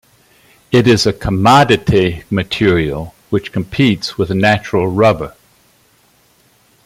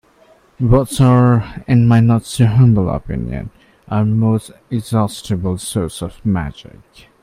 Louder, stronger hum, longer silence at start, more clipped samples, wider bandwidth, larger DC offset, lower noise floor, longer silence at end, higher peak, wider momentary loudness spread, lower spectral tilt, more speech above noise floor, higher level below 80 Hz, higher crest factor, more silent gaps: first, -13 LUFS vs -16 LUFS; neither; about the same, 0.7 s vs 0.6 s; neither; first, 16 kHz vs 14.5 kHz; neither; about the same, -53 dBFS vs -50 dBFS; first, 1.55 s vs 0.6 s; about the same, 0 dBFS vs 0 dBFS; about the same, 11 LU vs 13 LU; second, -6 dB/octave vs -7.5 dB/octave; first, 40 dB vs 35 dB; second, -40 dBFS vs -34 dBFS; about the same, 14 dB vs 16 dB; neither